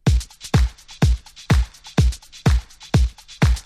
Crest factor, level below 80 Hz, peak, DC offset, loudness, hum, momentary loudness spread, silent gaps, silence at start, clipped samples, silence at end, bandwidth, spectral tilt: 14 dB; -22 dBFS; -4 dBFS; under 0.1%; -22 LUFS; none; 4 LU; none; 0.05 s; under 0.1%; 0.05 s; 13.5 kHz; -6 dB/octave